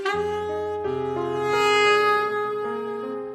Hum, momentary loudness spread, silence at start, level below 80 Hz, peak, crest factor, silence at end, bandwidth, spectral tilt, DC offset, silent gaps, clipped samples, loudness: none; 11 LU; 0 s; -58 dBFS; -6 dBFS; 16 dB; 0 s; 13.5 kHz; -4 dB/octave; under 0.1%; none; under 0.1%; -23 LUFS